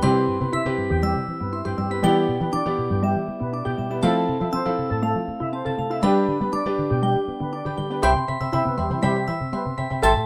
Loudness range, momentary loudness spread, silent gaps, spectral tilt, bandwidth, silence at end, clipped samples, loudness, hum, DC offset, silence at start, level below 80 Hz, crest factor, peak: 1 LU; 8 LU; none; -7 dB/octave; 15.5 kHz; 0 s; under 0.1%; -23 LUFS; none; under 0.1%; 0 s; -36 dBFS; 18 dB; -6 dBFS